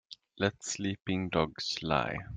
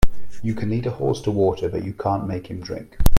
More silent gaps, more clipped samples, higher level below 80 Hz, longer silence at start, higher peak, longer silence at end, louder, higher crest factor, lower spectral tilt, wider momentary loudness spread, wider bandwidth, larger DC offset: neither; neither; second, -58 dBFS vs -26 dBFS; about the same, 0.1 s vs 0 s; second, -12 dBFS vs 0 dBFS; about the same, 0 s vs 0 s; second, -33 LUFS vs -25 LUFS; about the same, 22 dB vs 18 dB; second, -4.5 dB/octave vs -7 dB/octave; second, 4 LU vs 10 LU; second, 9.8 kHz vs 16 kHz; neither